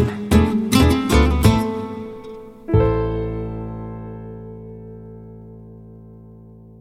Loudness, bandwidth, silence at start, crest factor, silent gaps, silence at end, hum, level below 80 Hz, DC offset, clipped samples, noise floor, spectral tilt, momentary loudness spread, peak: -18 LUFS; 16.5 kHz; 0 s; 20 dB; none; 0.05 s; none; -28 dBFS; under 0.1%; under 0.1%; -42 dBFS; -6.5 dB/octave; 23 LU; -2 dBFS